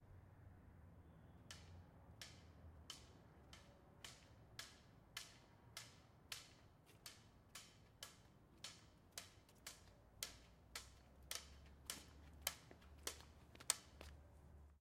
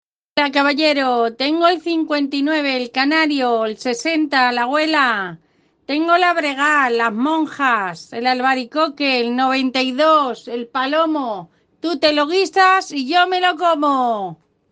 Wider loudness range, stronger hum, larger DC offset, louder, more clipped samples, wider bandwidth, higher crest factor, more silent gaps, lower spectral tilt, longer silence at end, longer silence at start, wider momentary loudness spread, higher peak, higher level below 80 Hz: first, 10 LU vs 1 LU; neither; neither; second, -55 LUFS vs -17 LUFS; neither; first, 16 kHz vs 9.4 kHz; first, 42 dB vs 16 dB; neither; second, -1.5 dB/octave vs -3 dB/octave; second, 0 s vs 0.35 s; second, 0 s vs 0.35 s; first, 16 LU vs 8 LU; second, -16 dBFS vs -2 dBFS; about the same, -70 dBFS vs -68 dBFS